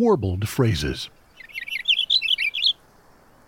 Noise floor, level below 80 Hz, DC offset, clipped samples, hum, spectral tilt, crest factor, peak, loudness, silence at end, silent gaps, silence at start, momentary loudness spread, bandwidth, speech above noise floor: -53 dBFS; -44 dBFS; under 0.1%; under 0.1%; none; -4.5 dB/octave; 16 dB; -8 dBFS; -21 LUFS; 0.75 s; none; 0 s; 15 LU; 17 kHz; 32 dB